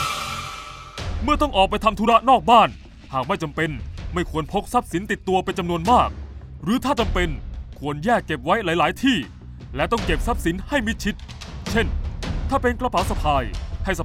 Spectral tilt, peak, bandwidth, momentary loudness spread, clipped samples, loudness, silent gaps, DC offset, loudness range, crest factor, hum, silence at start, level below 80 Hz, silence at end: -5 dB/octave; 0 dBFS; 16 kHz; 15 LU; under 0.1%; -22 LUFS; none; under 0.1%; 5 LU; 22 dB; none; 0 s; -32 dBFS; 0 s